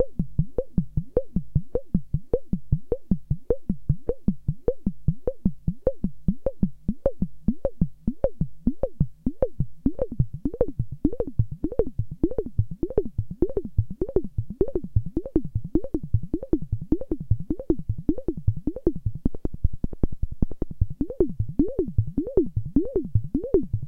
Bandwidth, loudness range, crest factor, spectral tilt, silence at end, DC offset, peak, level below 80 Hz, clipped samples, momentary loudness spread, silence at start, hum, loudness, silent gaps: 2 kHz; 1 LU; 20 dB; -13 dB/octave; 0 s; under 0.1%; -4 dBFS; -32 dBFS; under 0.1%; 4 LU; 0 s; none; -28 LUFS; none